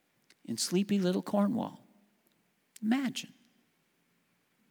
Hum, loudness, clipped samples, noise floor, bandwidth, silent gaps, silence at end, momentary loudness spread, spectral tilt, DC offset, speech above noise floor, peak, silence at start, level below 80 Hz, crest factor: none; -32 LUFS; under 0.1%; -74 dBFS; over 20 kHz; none; 1.45 s; 12 LU; -5 dB/octave; under 0.1%; 43 dB; -16 dBFS; 0.5 s; -86 dBFS; 18 dB